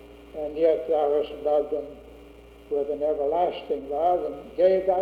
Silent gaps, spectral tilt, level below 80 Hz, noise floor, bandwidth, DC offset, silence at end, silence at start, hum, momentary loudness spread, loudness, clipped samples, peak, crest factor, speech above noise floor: none; -7 dB/octave; -54 dBFS; -48 dBFS; 5 kHz; under 0.1%; 0 s; 0 s; none; 11 LU; -25 LUFS; under 0.1%; -10 dBFS; 16 dB; 23 dB